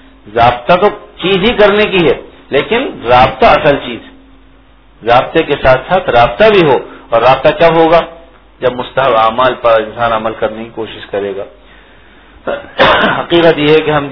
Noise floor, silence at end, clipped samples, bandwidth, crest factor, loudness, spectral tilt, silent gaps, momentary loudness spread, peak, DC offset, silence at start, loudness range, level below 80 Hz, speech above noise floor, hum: -43 dBFS; 0 s; 1%; 5.4 kHz; 10 dB; -10 LUFS; -7 dB/octave; none; 14 LU; 0 dBFS; under 0.1%; 0.25 s; 5 LU; -34 dBFS; 33 dB; none